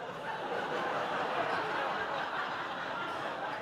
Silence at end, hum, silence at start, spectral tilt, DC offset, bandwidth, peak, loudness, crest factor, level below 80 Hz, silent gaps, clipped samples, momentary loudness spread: 0 s; none; 0 s; -4 dB/octave; under 0.1%; 17.5 kHz; -20 dBFS; -35 LUFS; 16 dB; -72 dBFS; none; under 0.1%; 4 LU